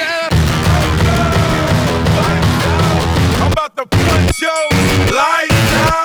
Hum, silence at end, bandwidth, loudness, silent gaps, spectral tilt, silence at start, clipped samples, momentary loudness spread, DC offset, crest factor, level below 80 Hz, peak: none; 0 s; over 20 kHz; -13 LUFS; none; -5 dB/octave; 0 s; under 0.1%; 3 LU; under 0.1%; 10 dB; -24 dBFS; -2 dBFS